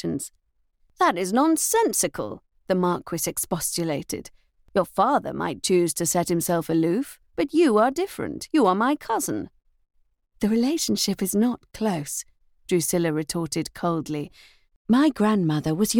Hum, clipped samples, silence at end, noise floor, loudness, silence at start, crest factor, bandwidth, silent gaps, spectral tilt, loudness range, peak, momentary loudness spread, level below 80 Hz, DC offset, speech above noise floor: none; under 0.1%; 0 s; -65 dBFS; -24 LUFS; 0.05 s; 16 dB; 19 kHz; 14.76-14.85 s; -4.5 dB/octave; 3 LU; -8 dBFS; 12 LU; -56 dBFS; under 0.1%; 42 dB